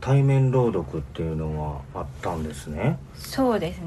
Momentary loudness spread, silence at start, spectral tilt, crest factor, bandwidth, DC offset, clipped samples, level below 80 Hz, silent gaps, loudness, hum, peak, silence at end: 13 LU; 0 s; -7.5 dB/octave; 14 dB; 12.5 kHz; under 0.1%; under 0.1%; -40 dBFS; none; -25 LUFS; none; -10 dBFS; 0 s